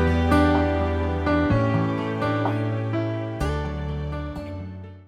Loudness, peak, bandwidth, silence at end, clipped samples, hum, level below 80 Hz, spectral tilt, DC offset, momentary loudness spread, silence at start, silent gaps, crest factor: -24 LUFS; -6 dBFS; 11.5 kHz; 0.05 s; under 0.1%; none; -34 dBFS; -8 dB/octave; under 0.1%; 13 LU; 0 s; none; 16 dB